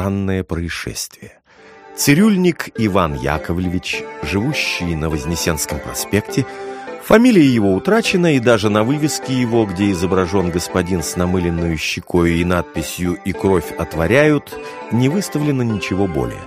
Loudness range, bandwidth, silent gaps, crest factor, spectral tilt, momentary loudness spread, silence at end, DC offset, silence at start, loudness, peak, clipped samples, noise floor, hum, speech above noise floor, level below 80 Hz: 5 LU; 15.5 kHz; none; 16 dB; -5.5 dB/octave; 10 LU; 0 s; under 0.1%; 0 s; -17 LUFS; 0 dBFS; under 0.1%; -43 dBFS; none; 27 dB; -38 dBFS